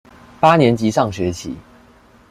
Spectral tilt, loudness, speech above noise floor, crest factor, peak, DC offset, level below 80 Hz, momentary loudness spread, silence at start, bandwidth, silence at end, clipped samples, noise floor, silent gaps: -6 dB/octave; -16 LUFS; 33 dB; 18 dB; 0 dBFS; under 0.1%; -48 dBFS; 18 LU; 0.4 s; 15 kHz; 0.7 s; under 0.1%; -48 dBFS; none